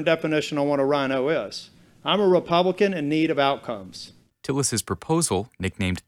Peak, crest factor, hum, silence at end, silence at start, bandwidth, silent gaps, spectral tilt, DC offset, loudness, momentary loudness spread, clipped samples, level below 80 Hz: -6 dBFS; 18 dB; none; 0.1 s; 0 s; 16.5 kHz; none; -4.5 dB/octave; under 0.1%; -23 LUFS; 15 LU; under 0.1%; -56 dBFS